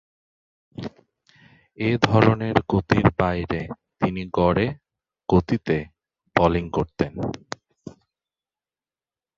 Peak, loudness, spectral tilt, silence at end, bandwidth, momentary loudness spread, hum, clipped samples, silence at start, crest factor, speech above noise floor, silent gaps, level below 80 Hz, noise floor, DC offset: -2 dBFS; -22 LUFS; -7.5 dB/octave; 1.45 s; 7.4 kHz; 18 LU; none; under 0.1%; 0.8 s; 24 dB; over 69 dB; none; -42 dBFS; under -90 dBFS; under 0.1%